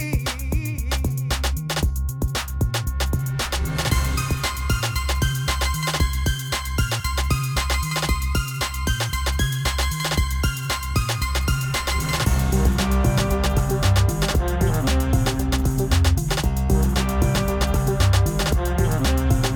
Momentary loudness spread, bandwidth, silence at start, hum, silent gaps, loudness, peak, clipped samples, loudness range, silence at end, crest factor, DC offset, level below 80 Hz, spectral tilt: 5 LU; over 20 kHz; 0 s; none; none; -22 LUFS; -6 dBFS; under 0.1%; 3 LU; 0 s; 14 dB; under 0.1%; -24 dBFS; -4.5 dB/octave